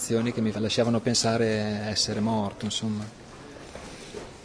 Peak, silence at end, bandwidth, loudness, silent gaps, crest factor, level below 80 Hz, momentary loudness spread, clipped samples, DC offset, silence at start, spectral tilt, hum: -10 dBFS; 0 s; 11 kHz; -26 LUFS; none; 16 dB; -54 dBFS; 18 LU; under 0.1%; under 0.1%; 0 s; -4.5 dB/octave; none